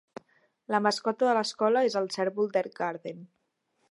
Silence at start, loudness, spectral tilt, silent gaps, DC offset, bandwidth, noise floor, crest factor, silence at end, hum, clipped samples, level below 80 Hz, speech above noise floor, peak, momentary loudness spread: 0.7 s; -28 LUFS; -4 dB/octave; none; under 0.1%; 11.5 kHz; -75 dBFS; 20 dB; 0.65 s; none; under 0.1%; -84 dBFS; 47 dB; -10 dBFS; 10 LU